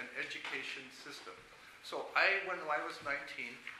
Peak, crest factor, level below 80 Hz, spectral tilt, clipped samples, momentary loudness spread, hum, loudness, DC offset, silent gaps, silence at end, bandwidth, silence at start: -16 dBFS; 24 dB; -78 dBFS; -2 dB/octave; under 0.1%; 20 LU; none; -37 LUFS; under 0.1%; none; 0 s; 15.5 kHz; 0 s